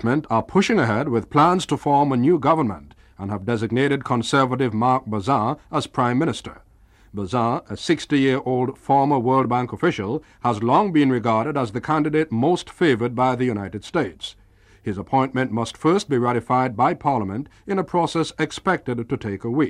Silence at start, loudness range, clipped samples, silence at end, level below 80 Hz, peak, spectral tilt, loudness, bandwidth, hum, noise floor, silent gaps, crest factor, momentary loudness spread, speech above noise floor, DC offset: 0 s; 3 LU; under 0.1%; 0 s; -52 dBFS; -4 dBFS; -6.5 dB/octave; -21 LUFS; 11.5 kHz; none; -53 dBFS; none; 16 dB; 9 LU; 32 dB; under 0.1%